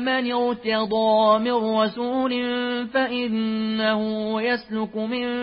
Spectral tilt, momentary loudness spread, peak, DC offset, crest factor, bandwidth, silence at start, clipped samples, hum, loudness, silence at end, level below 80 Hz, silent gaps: -9.5 dB/octave; 7 LU; -8 dBFS; under 0.1%; 14 dB; 5.6 kHz; 0 s; under 0.1%; none; -23 LUFS; 0 s; -60 dBFS; none